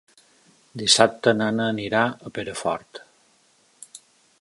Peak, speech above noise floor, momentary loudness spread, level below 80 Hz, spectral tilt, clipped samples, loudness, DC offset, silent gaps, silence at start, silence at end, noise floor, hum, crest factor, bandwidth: 0 dBFS; 39 dB; 27 LU; -62 dBFS; -3 dB/octave; under 0.1%; -22 LUFS; under 0.1%; none; 0.75 s; 0.45 s; -61 dBFS; none; 24 dB; 11.5 kHz